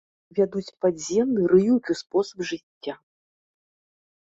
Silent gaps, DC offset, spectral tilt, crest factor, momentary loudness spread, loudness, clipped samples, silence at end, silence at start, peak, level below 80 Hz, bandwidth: 2.63-2.81 s; under 0.1%; -6 dB/octave; 18 dB; 17 LU; -24 LUFS; under 0.1%; 1.4 s; 0.35 s; -6 dBFS; -64 dBFS; 8 kHz